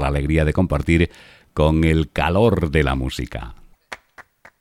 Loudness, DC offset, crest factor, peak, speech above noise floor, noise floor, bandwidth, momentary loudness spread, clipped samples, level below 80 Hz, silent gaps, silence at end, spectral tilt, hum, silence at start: -19 LUFS; under 0.1%; 18 dB; -2 dBFS; 30 dB; -48 dBFS; 13.5 kHz; 21 LU; under 0.1%; -28 dBFS; none; 0.4 s; -7 dB/octave; none; 0 s